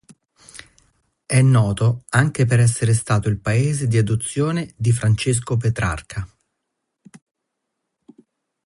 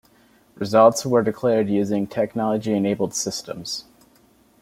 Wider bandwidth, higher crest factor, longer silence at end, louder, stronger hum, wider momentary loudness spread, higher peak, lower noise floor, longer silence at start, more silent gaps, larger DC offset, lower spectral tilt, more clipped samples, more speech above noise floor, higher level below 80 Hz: second, 11.5 kHz vs 16 kHz; about the same, 18 dB vs 20 dB; first, 2.4 s vs 0.8 s; about the same, -19 LUFS vs -21 LUFS; neither; second, 11 LU vs 14 LU; about the same, -4 dBFS vs -2 dBFS; first, -78 dBFS vs -57 dBFS; about the same, 0.55 s vs 0.6 s; neither; neither; about the same, -6 dB/octave vs -5 dB/octave; neither; first, 60 dB vs 36 dB; first, -42 dBFS vs -62 dBFS